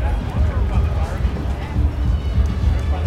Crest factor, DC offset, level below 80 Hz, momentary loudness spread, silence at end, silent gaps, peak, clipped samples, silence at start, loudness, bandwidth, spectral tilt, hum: 12 dB; under 0.1%; -20 dBFS; 3 LU; 0 s; none; -6 dBFS; under 0.1%; 0 s; -21 LUFS; 8.4 kHz; -8 dB/octave; none